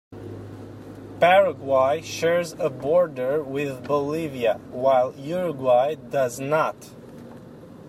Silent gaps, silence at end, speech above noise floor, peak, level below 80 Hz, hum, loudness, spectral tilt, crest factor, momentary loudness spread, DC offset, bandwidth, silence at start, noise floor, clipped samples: none; 0 s; 21 dB; -6 dBFS; -60 dBFS; none; -23 LUFS; -5 dB/octave; 18 dB; 21 LU; under 0.1%; 15.5 kHz; 0.1 s; -43 dBFS; under 0.1%